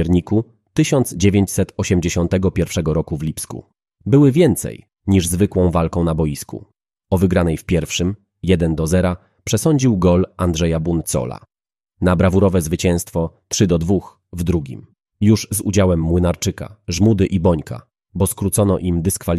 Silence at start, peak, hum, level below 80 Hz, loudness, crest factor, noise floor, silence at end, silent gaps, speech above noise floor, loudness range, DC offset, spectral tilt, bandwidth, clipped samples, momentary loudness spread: 0 s; -2 dBFS; none; -36 dBFS; -18 LUFS; 16 dB; -76 dBFS; 0 s; none; 59 dB; 2 LU; under 0.1%; -6 dB/octave; 14 kHz; under 0.1%; 12 LU